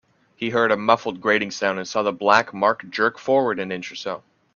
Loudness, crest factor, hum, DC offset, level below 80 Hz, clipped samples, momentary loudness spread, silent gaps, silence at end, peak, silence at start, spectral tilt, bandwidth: -21 LUFS; 22 dB; none; under 0.1%; -66 dBFS; under 0.1%; 12 LU; none; 0.4 s; 0 dBFS; 0.4 s; -4 dB/octave; 7.2 kHz